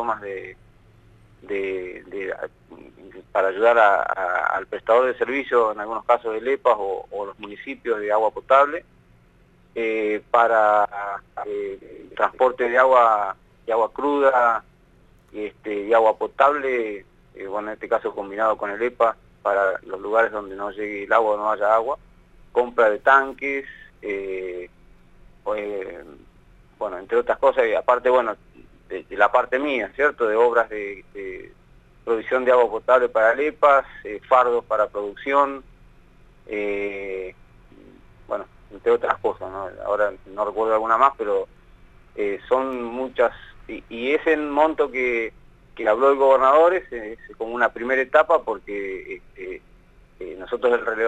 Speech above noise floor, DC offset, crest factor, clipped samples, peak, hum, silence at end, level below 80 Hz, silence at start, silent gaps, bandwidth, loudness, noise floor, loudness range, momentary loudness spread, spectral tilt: 34 dB; under 0.1%; 20 dB; under 0.1%; -2 dBFS; none; 0 s; -54 dBFS; 0 s; none; 9 kHz; -21 LUFS; -55 dBFS; 7 LU; 17 LU; -5 dB/octave